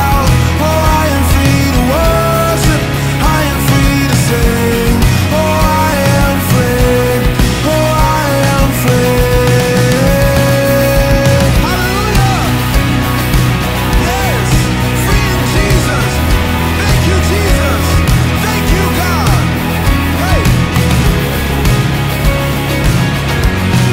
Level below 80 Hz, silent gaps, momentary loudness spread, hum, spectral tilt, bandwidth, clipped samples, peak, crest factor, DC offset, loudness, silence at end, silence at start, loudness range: -18 dBFS; none; 3 LU; none; -5.5 dB/octave; 16.5 kHz; under 0.1%; 0 dBFS; 10 dB; under 0.1%; -11 LUFS; 0 s; 0 s; 2 LU